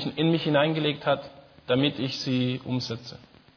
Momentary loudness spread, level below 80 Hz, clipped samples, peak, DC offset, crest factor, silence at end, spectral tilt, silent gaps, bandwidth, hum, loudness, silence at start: 14 LU; -62 dBFS; under 0.1%; -8 dBFS; under 0.1%; 18 dB; 0.4 s; -6.5 dB/octave; none; 5.4 kHz; none; -26 LUFS; 0 s